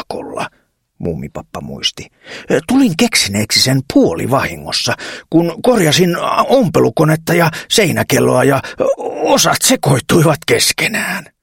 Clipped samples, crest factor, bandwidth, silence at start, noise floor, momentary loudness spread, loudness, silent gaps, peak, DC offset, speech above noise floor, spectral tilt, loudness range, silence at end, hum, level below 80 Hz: under 0.1%; 14 dB; 17 kHz; 0 s; -59 dBFS; 13 LU; -13 LUFS; none; 0 dBFS; under 0.1%; 45 dB; -4 dB/octave; 3 LU; 0.2 s; none; -44 dBFS